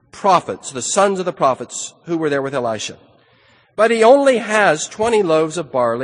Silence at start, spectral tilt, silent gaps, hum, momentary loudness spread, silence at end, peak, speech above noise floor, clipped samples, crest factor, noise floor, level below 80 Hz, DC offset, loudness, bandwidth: 0.15 s; -3.5 dB/octave; none; none; 14 LU; 0 s; 0 dBFS; 37 dB; under 0.1%; 16 dB; -53 dBFS; -60 dBFS; under 0.1%; -16 LUFS; 10 kHz